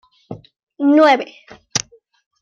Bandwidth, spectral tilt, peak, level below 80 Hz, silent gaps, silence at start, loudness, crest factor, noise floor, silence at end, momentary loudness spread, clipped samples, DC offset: 7.6 kHz; -3.5 dB/octave; -2 dBFS; -60 dBFS; 0.63-0.67 s; 0.3 s; -16 LUFS; 18 dB; -37 dBFS; 0.65 s; 25 LU; under 0.1%; under 0.1%